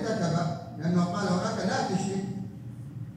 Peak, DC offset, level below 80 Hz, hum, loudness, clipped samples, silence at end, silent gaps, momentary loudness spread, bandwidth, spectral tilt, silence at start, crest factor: -14 dBFS; under 0.1%; -62 dBFS; none; -29 LUFS; under 0.1%; 0 s; none; 13 LU; 10.5 kHz; -6 dB/octave; 0 s; 14 dB